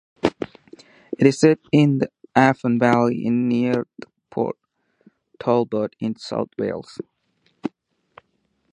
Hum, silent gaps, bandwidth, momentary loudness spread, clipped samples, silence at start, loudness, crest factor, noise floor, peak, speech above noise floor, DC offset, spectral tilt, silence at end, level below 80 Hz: none; none; 10.5 kHz; 17 LU; under 0.1%; 0.25 s; -20 LUFS; 22 dB; -69 dBFS; 0 dBFS; 49 dB; under 0.1%; -7 dB/octave; 1.05 s; -60 dBFS